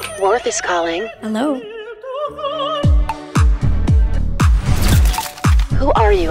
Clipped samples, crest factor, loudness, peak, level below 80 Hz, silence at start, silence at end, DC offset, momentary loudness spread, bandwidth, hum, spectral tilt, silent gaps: under 0.1%; 14 dB; -17 LUFS; -2 dBFS; -18 dBFS; 0 s; 0 s; under 0.1%; 9 LU; 16.5 kHz; none; -5.5 dB/octave; none